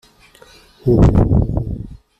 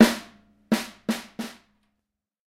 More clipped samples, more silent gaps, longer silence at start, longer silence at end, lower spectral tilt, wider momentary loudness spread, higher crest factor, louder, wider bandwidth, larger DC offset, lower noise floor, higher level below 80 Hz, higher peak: neither; neither; first, 0.85 s vs 0 s; second, 0.25 s vs 1 s; first, -10 dB/octave vs -4.5 dB/octave; about the same, 14 LU vs 13 LU; second, 14 dB vs 26 dB; first, -16 LUFS vs -28 LUFS; second, 8.2 kHz vs 16 kHz; neither; second, -47 dBFS vs -82 dBFS; first, -24 dBFS vs -62 dBFS; about the same, -2 dBFS vs 0 dBFS